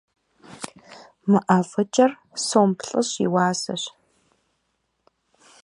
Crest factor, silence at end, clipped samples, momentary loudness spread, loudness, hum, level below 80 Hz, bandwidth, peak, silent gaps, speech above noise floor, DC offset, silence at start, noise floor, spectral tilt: 22 dB; 1.75 s; under 0.1%; 17 LU; -22 LUFS; none; -70 dBFS; 11.5 kHz; -2 dBFS; none; 53 dB; under 0.1%; 0.5 s; -73 dBFS; -5 dB/octave